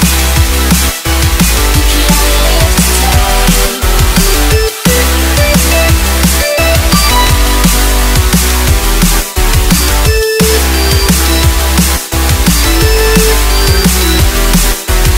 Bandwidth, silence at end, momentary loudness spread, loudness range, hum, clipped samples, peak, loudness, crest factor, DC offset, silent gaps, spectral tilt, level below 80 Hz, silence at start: 16.5 kHz; 0 s; 2 LU; 1 LU; none; 0.5%; 0 dBFS; -9 LUFS; 8 dB; 0.9%; none; -3.5 dB/octave; -10 dBFS; 0 s